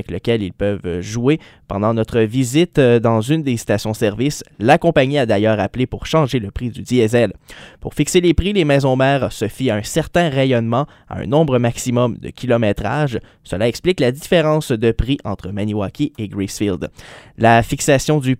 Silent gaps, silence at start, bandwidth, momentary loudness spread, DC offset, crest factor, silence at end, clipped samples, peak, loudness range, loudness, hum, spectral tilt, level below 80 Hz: none; 0 s; 16 kHz; 10 LU; under 0.1%; 16 dB; 0.05 s; under 0.1%; 0 dBFS; 3 LU; -17 LUFS; none; -6 dB/octave; -36 dBFS